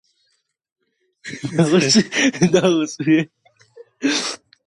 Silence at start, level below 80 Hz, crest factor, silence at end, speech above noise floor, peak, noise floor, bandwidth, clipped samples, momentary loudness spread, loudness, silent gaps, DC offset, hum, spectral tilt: 1.25 s; -60 dBFS; 18 dB; 0.3 s; 52 dB; -2 dBFS; -68 dBFS; 11.5 kHz; under 0.1%; 16 LU; -17 LUFS; none; under 0.1%; none; -4.5 dB/octave